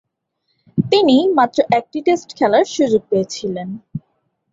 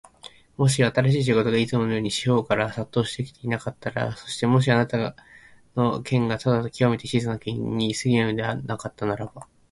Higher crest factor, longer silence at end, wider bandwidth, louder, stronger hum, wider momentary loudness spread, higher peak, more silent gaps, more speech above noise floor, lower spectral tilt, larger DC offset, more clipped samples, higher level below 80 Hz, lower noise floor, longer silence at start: about the same, 16 dB vs 20 dB; first, 0.55 s vs 0.3 s; second, 7.8 kHz vs 11.5 kHz; first, -16 LUFS vs -24 LUFS; neither; first, 15 LU vs 9 LU; about the same, -2 dBFS vs -4 dBFS; neither; first, 55 dB vs 25 dB; about the same, -5.5 dB/octave vs -6 dB/octave; neither; neither; about the same, -58 dBFS vs -54 dBFS; first, -71 dBFS vs -48 dBFS; first, 0.75 s vs 0.25 s